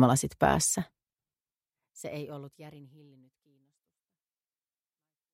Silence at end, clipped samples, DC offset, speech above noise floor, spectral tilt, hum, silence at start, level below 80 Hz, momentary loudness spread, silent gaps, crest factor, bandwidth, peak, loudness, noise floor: 2.5 s; under 0.1%; under 0.1%; over 60 dB; -4.5 dB/octave; none; 0 s; -56 dBFS; 24 LU; none; 26 dB; 16 kHz; -8 dBFS; -28 LUFS; under -90 dBFS